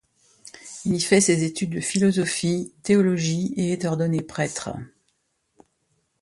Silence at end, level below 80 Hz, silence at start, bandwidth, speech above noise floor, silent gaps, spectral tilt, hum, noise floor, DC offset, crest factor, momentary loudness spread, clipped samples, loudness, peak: 1.35 s; -58 dBFS; 0.45 s; 11.5 kHz; 49 dB; none; -5 dB/octave; none; -71 dBFS; under 0.1%; 20 dB; 13 LU; under 0.1%; -23 LUFS; -4 dBFS